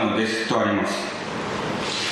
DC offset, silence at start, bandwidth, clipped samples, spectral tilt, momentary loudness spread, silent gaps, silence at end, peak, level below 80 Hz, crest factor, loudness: under 0.1%; 0 s; 12.5 kHz; under 0.1%; -4 dB/octave; 6 LU; none; 0 s; -8 dBFS; -54 dBFS; 16 dB; -24 LUFS